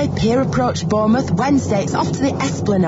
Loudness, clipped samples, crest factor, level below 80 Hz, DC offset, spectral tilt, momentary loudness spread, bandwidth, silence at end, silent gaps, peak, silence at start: -17 LUFS; under 0.1%; 12 dB; -40 dBFS; under 0.1%; -6.5 dB/octave; 3 LU; 8 kHz; 0 s; none; -6 dBFS; 0 s